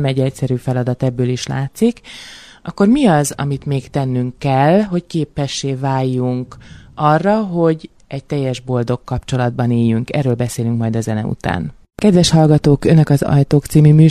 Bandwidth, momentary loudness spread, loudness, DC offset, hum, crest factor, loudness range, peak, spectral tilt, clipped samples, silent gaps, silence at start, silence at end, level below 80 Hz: 13 kHz; 12 LU; -16 LUFS; under 0.1%; none; 14 dB; 4 LU; 0 dBFS; -7 dB/octave; under 0.1%; none; 0 s; 0 s; -40 dBFS